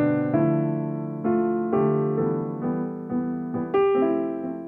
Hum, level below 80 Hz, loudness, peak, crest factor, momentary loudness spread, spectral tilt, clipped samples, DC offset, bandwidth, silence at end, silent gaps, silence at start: none; -62 dBFS; -24 LUFS; -10 dBFS; 14 dB; 7 LU; -11.5 dB/octave; under 0.1%; under 0.1%; 3.5 kHz; 0 s; none; 0 s